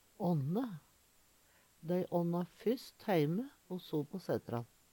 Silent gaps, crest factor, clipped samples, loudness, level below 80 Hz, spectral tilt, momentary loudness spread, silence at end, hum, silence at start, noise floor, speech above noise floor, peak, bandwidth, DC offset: none; 18 dB; under 0.1%; -38 LUFS; -76 dBFS; -8 dB/octave; 11 LU; 0.3 s; none; 0.2 s; -69 dBFS; 32 dB; -20 dBFS; 18.5 kHz; under 0.1%